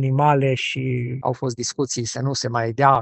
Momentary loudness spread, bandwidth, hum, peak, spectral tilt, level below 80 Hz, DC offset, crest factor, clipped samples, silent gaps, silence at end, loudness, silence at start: 7 LU; 8.6 kHz; none; -2 dBFS; -5 dB/octave; -58 dBFS; under 0.1%; 20 dB; under 0.1%; none; 0 s; -22 LUFS; 0 s